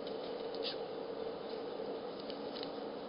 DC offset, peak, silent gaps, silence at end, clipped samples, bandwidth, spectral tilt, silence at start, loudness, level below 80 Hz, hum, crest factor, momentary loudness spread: under 0.1%; -26 dBFS; none; 0 s; under 0.1%; 5.2 kHz; -2.5 dB/octave; 0 s; -42 LUFS; -74 dBFS; none; 16 dB; 3 LU